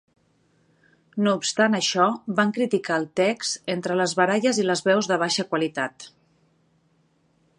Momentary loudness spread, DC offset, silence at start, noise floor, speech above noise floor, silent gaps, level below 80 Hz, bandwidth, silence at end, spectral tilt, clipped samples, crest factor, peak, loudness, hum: 7 LU; under 0.1%; 1.15 s; -65 dBFS; 42 dB; none; -74 dBFS; 11 kHz; 1.5 s; -4 dB/octave; under 0.1%; 20 dB; -4 dBFS; -23 LUFS; none